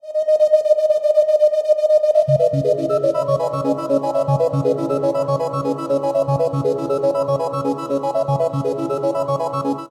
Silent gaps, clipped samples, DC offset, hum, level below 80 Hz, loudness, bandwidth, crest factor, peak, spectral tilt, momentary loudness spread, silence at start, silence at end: none; under 0.1%; under 0.1%; none; -58 dBFS; -18 LUFS; 12.5 kHz; 14 dB; -4 dBFS; -8 dB/octave; 7 LU; 0.05 s; 0.05 s